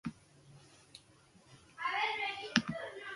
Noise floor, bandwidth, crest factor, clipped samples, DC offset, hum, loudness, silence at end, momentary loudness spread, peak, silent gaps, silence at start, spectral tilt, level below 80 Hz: -64 dBFS; 11.5 kHz; 32 dB; under 0.1%; under 0.1%; none; -36 LUFS; 0 s; 23 LU; -8 dBFS; none; 0.05 s; -3.5 dB/octave; -72 dBFS